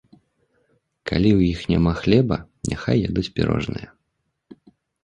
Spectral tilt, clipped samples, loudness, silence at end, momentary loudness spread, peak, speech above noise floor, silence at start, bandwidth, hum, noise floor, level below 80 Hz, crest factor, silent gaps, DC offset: -7 dB/octave; under 0.1%; -21 LUFS; 1.2 s; 11 LU; -2 dBFS; 55 dB; 1.05 s; 10.5 kHz; none; -74 dBFS; -38 dBFS; 20 dB; none; under 0.1%